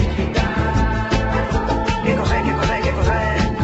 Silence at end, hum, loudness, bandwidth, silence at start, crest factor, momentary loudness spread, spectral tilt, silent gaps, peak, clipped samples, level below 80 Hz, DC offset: 0 s; none; -19 LUFS; 8.2 kHz; 0 s; 14 dB; 2 LU; -6.5 dB/octave; none; -4 dBFS; under 0.1%; -24 dBFS; under 0.1%